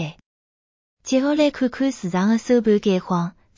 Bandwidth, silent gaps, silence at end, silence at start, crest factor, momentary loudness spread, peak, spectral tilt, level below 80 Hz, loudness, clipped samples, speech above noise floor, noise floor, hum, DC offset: 7.6 kHz; 0.26-0.97 s; 0.3 s; 0 s; 16 dB; 7 LU; -4 dBFS; -6 dB/octave; -58 dBFS; -20 LUFS; under 0.1%; over 71 dB; under -90 dBFS; none; under 0.1%